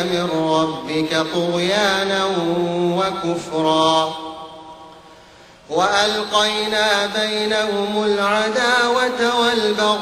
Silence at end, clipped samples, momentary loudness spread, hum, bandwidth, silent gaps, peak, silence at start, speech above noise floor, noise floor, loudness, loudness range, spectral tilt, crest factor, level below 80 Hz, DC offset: 0 s; under 0.1%; 7 LU; none; 15.5 kHz; none; -2 dBFS; 0 s; 27 dB; -45 dBFS; -18 LUFS; 3 LU; -3.5 dB/octave; 16 dB; -56 dBFS; under 0.1%